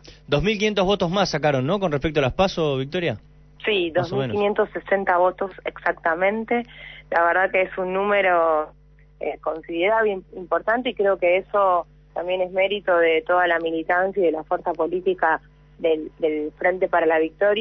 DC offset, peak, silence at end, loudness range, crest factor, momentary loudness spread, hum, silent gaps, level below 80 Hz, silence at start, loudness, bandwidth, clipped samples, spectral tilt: under 0.1%; -6 dBFS; 0 s; 2 LU; 16 dB; 8 LU; none; none; -48 dBFS; 0.05 s; -22 LUFS; 6.4 kHz; under 0.1%; -5.5 dB/octave